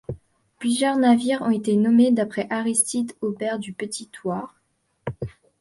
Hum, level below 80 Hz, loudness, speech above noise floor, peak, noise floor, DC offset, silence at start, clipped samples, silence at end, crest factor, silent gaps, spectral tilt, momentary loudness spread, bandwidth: none; -56 dBFS; -22 LUFS; 27 dB; -6 dBFS; -48 dBFS; under 0.1%; 0.1 s; under 0.1%; 0.3 s; 16 dB; none; -4.5 dB/octave; 18 LU; 11.5 kHz